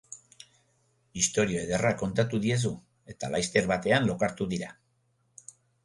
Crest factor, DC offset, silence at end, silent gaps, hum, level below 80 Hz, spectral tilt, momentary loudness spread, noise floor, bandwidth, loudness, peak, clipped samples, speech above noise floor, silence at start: 20 dB; under 0.1%; 1.15 s; none; none; -56 dBFS; -4.5 dB/octave; 20 LU; -71 dBFS; 11.5 kHz; -28 LUFS; -10 dBFS; under 0.1%; 44 dB; 0.1 s